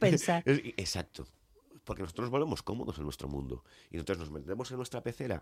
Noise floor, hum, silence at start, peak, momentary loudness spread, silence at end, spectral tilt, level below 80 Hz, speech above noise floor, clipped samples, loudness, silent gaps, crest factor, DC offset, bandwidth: -60 dBFS; none; 0 s; -14 dBFS; 17 LU; 0 s; -5.5 dB/octave; -54 dBFS; 26 dB; under 0.1%; -35 LUFS; none; 22 dB; under 0.1%; 16 kHz